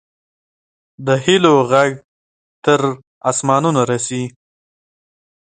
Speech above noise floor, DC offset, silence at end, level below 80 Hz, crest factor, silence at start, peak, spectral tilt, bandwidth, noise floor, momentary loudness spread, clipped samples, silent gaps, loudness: over 75 dB; under 0.1%; 1.1 s; -60 dBFS; 18 dB; 1 s; 0 dBFS; -4.5 dB/octave; 9.4 kHz; under -90 dBFS; 13 LU; under 0.1%; 2.04-2.62 s, 3.07-3.21 s; -16 LUFS